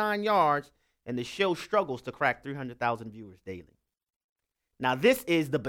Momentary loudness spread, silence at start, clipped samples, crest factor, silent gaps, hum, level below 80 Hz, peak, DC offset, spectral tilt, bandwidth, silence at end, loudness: 19 LU; 0 s; under 0.1%; 20 dB; 4.16-4.36 s; none; -66 dBFS; -10 dBFS; under 0.1%; -5 dB/octave; 17 kHz; 0 s; -28 LUFS